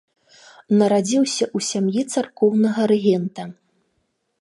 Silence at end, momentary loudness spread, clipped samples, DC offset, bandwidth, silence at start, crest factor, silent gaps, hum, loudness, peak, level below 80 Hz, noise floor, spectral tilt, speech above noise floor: 0.9 s; 7 LU; under 0.1%; under 0.1%; 11.5 kHz; 0.7 s; 16 dB; none; none; -19 LUFS; -4 dBFS; -72 dBFS; -71 dBFS; -5 dB/octave; 52 dB